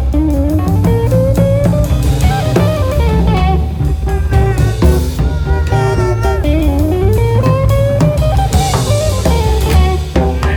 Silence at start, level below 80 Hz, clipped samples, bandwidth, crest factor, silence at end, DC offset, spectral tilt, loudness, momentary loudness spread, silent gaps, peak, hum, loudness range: 0 s; -16 dBFS; under 0.1%; 18 kHz; 10 dB; 0 s; under 0.1%; -7 dB/octave; -13 LUFS; 3 LU; none; 0 dBFS; none; 1 LU